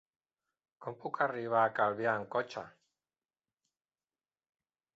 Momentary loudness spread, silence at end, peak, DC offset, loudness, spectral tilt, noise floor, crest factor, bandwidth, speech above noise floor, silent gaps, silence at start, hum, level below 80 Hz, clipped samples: 16 LU; 2.25 s; -16 dBFS; under 0.1%; -33 LUFS; -3.5 dB/octave; under -90 dBFS; 22 dB; 7.6 kHz; over 57 dB; none; 0.8 s; none; -82 dBFS; under 0.1%